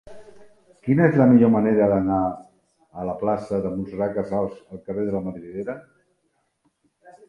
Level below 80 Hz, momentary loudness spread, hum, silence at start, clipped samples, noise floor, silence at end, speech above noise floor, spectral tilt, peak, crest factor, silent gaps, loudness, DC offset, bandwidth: -54 dBFS; 18 LU; none; 0.05 s; under 0.1%; -71 dBFS; 1.5 s; 50 dB; -10.5 dB/octave; -4 dBFS; 20 dB; none; -22 LUFS; under 0.1%; 5.4 kHz